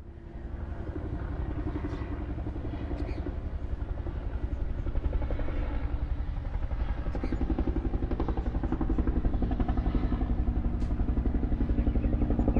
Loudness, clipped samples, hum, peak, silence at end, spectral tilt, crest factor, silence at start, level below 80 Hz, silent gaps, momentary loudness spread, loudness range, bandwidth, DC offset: -33 LUFS; under 0.1%; none; -14 dBFS; 0 s; -10 dB/octave; 16 dB; 0 s; -32 dBFS; none; 7 LU; 5 LU; 5 kHz; under 0.1%